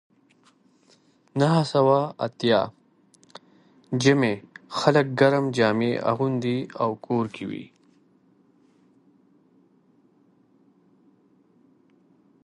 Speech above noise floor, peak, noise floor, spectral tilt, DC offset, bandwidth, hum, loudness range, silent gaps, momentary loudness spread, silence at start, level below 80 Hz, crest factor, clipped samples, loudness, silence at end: 39 dB; -4 dBFS; -61 dBFS; -6 dB/octave; under 0.1%; 11.5 kHz; none; 10 LU; none; 13 LU; 1.35 s; -68 dBFS; 22 dB; under 0.1%; -23 LUFS; 4.8 s